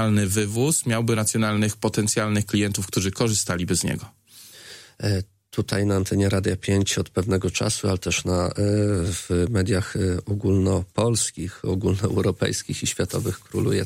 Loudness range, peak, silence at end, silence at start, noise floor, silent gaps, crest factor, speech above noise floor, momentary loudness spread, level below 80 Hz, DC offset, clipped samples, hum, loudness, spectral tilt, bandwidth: 3 LU; -6 dBFS; 0 s; 0 s; -46 dBFS; none; 16 dB; 23 dB; 6 LU; -46 dBFS; under 0.1%; under 0.1%; none; -23 LUFS; -5 dB/octave; 16 kHz